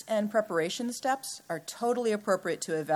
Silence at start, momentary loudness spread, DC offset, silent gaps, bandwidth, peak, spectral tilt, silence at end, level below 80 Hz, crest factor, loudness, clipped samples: 0 s; 7 LU; under 0.1%; none; 18.5 kHz; -12 dBFS; -4 dB/octave; 0 s; -82 dBFS; 18 dB; -31 LUFS; under 0.1%